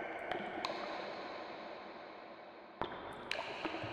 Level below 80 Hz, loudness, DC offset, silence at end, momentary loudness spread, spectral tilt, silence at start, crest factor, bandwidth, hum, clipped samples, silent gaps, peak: -72 dBFS; -44 LUFS; under 0.1%; 0 s; 11 LU; -4.5 dB/octave; 0 s; 26 dB; 12.5 kHz; none; under 0.1%; none; -18 dBFS